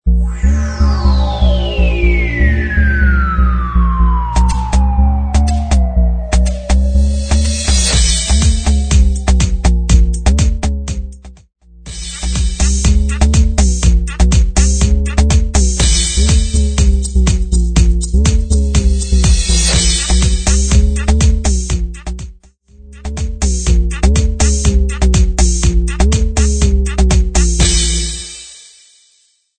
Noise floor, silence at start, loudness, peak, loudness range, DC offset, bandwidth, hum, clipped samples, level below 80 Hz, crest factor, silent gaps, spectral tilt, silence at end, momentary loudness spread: -55 dBFS; 0.05 s; -13 LUFS; 0 dBFS; 4 LU; under 0.1%; 9.4 kHz; none; under 0.1%; -12 dBFS; 12 dB; none; -4.5 dB/octave; 1 s; 6 LU